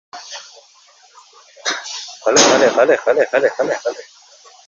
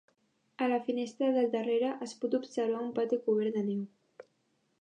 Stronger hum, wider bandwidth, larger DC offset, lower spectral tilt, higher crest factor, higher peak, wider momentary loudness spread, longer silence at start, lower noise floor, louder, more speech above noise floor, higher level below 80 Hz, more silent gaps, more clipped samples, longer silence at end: neither; second, 8 kHz vs 9.6 kHz; neither; second, -1.5 dB/octave vs -6 dB/octave; about the same, 18 dB vs 14 dB; first, 0 dBFS vs -18 dBFS; first, 21 LU vs 6 LU; second, 0.15 s vs 0.6 s; second, -47 dBFS vs -75 dBFS; first, -15 LUFS vs -32 LUFS; second, 30 dB vs 44 dB; first, -64 dBFS vs -88 dBFS; neither; neither; about the same, 0.65 s vs 0.6 s